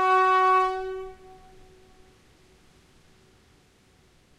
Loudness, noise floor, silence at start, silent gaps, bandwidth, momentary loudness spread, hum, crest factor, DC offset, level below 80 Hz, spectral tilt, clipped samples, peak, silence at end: -22 LUFS; -60 dBFS; 0 s; none; 12 kHz; 19 LU; none; 16 dB; under 0.1%; -58 dBFS; -4 dB/octave; under 0.1%; -12 dBFS; 3.25 s